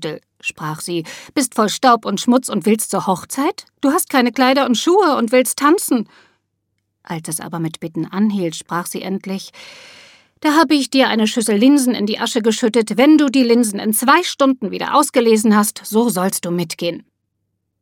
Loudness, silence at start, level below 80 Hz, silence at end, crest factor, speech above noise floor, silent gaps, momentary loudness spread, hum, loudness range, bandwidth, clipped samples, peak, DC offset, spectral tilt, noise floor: -16 LUFS; 0 s; -66 dBFS; 0.8 s; 16 dB; 56 dB; none; 12 LU; none; 9 LU; 18.5 kHz; under 0.1%; 0 dBFS; under 0.1%; -4 dB/octave; -72 dBFS